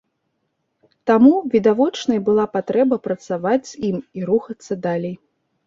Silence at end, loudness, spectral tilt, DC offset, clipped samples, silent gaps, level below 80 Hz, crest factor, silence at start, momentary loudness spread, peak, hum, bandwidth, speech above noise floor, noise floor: 0.5 s; -19 LUFS; -6.5 dB/octave; under 0.1%; under 0.1%; none; -62 dBFS; 18 dB; 1.05 s; 13 LU; -2 dBFS; none; 7.6 kHz; 54 dB; -72 dBFS